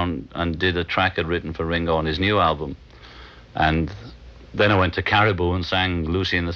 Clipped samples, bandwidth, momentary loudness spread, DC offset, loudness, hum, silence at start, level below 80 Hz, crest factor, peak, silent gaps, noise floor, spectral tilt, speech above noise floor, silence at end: under 0.1%; 6.8 kHz; 11 LU; under 0.1%; -21 LUFS; none; 0 s; -38 dBFS; 18 dB; -4 dBFS; none; -43 dBFS; -7 dB/octave; 22 dB; 0 s